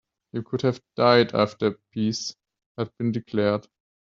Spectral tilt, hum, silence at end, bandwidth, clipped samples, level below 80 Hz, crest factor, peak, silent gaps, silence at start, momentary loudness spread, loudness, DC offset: -5.5 dB/octave; none; 0.55 s; 7.6 kHz; under 0.1%; -66 dBFS; 22 dB; -4 dBFS; 2.66-2.75 s; 0.35 s; 15 LU; -24 LUFS; under 0.1%